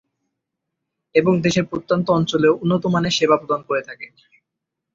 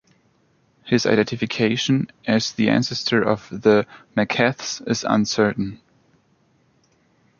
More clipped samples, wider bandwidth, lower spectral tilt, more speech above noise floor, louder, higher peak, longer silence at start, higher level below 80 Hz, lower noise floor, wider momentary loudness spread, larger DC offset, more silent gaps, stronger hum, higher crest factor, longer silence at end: neither; about the same, 7.8 kHz vs 7.2 kHz; about the same, -5.5 dB/octave vs -5 dB/octave; first, 63 dB vs 41 dB; about the same, -19 LUFS vs -21 LUFS; about the same, -2 dBFS vs -2 dBFS; first, 1.15 s vs 0.85 s; about the same, -56 dBFS vs -58 dBFS; first, -81 dBFS vs -62 dBFS; about the same, 8 LU vs 6 LU; neither; neither; neither; about the same, 18 dB vs 20 dB; second, 0.9 s vs 1.65 s